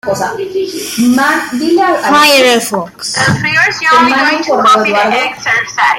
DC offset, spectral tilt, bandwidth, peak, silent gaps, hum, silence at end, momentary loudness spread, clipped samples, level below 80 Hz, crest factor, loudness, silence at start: under 0.1%; -3.5 dB/octave; 16.5 kHz; 0 dBFS; none; none; 0 s; 10 LU; under 0.1%; -50 dBFS; 10 dB; -10 LUFS; 0.05 s